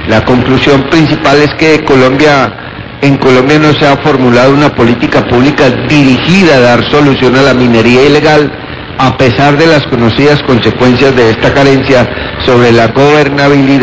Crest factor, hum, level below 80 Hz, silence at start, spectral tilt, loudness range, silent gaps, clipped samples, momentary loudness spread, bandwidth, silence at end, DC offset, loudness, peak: 6 dB; none; -30 dBFS; 0 s; -6 dB/octave; 1 LU; none; 8%; 4 LU; 8 kHz; 0 s; 1%; -6 LUFS; 0 dBFS